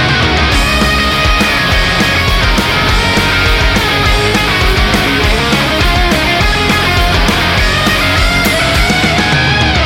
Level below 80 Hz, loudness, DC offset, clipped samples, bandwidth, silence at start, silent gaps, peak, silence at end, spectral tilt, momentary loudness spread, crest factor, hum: -16 dBFS; -10 LUFS; under 0.1%; under 0.1%; 17 kHz; 0 s; none; 0 dBFS; 0 s; -4 dB/octave; 1 LU; 10 dB; none